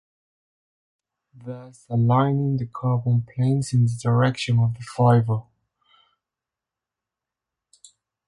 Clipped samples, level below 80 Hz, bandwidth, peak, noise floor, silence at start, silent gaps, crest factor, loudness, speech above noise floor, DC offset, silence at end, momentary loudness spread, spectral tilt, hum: under 0.1%; -56 dBFS; 11.5 kHz; -6 dBFS; -88 dBFS; 1.4 s; none; 18 dB; -22 LUFS; 67 dB; under 0.1%; 2.85 s; 17 LU; -7.5 dB/octave; none